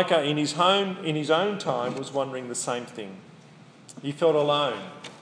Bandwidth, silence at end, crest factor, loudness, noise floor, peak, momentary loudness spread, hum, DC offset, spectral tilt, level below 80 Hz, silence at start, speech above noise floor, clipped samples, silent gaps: 10.5 kHz; 0 s; 20 dB; -25 LUFS; -50 dBFS; -8 dBFS; 16 LU; none; under 0.1%; -4 dB/octave; -78 dBFS; 0 s; 25 dB; under 0.1%; none